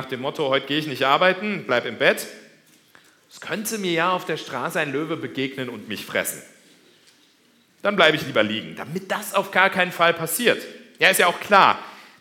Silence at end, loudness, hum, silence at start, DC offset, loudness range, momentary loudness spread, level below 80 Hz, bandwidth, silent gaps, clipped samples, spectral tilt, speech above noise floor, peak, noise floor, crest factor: 0.15 s; -21 LUFS; none; 0 s; under 0.1%; 8 LU; 14 LU; -70 dBFS; 18 kHz; none; under 0.1%; -3 dB/octave; 37 dB; 0 dBFS; -59 dBFS; 22 dB